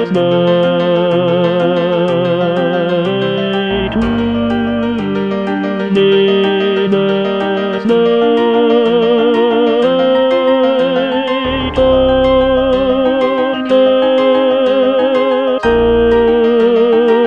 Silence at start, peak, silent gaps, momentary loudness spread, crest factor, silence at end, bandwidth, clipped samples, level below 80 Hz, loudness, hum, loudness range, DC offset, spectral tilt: 0 s; 0 dBFS; none; 5 LU; 12 dB; 0 s; 6.8 kHz; under 0.1%; -34 dBFS; -12 LUFS; none; 3 LU; 0.3%; -7.5 dB/octave